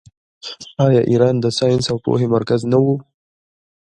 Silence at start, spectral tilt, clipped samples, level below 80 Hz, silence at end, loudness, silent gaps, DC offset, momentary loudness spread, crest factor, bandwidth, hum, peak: 0.45 s; -7 dB/octave; under 0.1%; -52 dBFS; 0.95 s; -16 LUFS; none; under 0.1%; 16 LU; 16 dB; 10.5 kHz; none; 0 dBFS